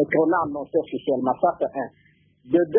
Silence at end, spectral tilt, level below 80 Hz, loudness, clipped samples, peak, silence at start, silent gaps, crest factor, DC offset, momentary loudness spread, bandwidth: 0 s; -11.5 dB/octave; -62 dBFS; -24 LUFS; under 0.1%; -6 dBFS; 0 s; none; 16 dB; under 0.1%; 8 LU; 3.6 kHz